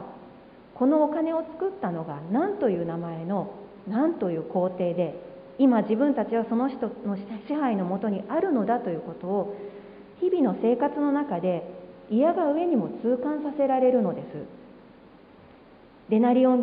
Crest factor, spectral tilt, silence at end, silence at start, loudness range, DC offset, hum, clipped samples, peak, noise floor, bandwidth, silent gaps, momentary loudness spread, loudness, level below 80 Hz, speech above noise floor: 16 dB; -12 dB/octave; 0 s; 0 s; 3 LU; under 0.1%; none; under 0.1%; -10 dBFS; -52 dBFS; 4.9 kHz; none; 13 LU; -26 LUFS; -66 dBFS; 27 dB